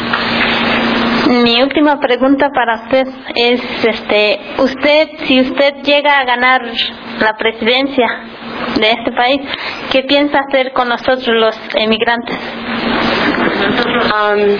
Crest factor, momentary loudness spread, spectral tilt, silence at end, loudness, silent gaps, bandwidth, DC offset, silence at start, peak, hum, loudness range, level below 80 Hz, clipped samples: 12 dB; 6 LU; -5.5 dB/octave; 0 s; -12 LUFS; none; 5.4 kHz; under 0.1%; 0 s; 0 dBFS; none; 2 LU; -44 dBFS; under 0.1%